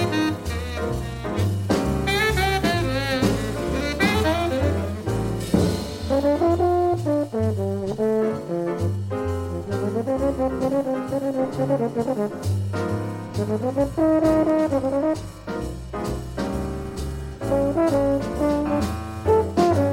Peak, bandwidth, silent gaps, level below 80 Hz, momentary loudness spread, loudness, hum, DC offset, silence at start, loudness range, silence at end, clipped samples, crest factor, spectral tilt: -6 dBFS; 17 kHz; none; -36 dBFS; 9 LU; -23 LUFS; none; under 0.1%; 0 s; 3 LU; 0 s; under 0.1%; 16 dB; -6.5 dB/octave